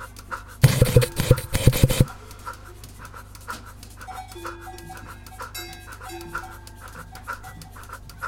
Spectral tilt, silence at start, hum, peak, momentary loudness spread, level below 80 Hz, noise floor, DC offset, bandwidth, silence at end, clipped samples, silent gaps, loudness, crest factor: -5.5 dB/octave; 0 s; none; -2 dBFS; 22 LU; -34 dBFS; -41 dBFS; under 0.1%; 17 kHz; 0 s; under 0.1%; none; -23 LUFS; 24 dB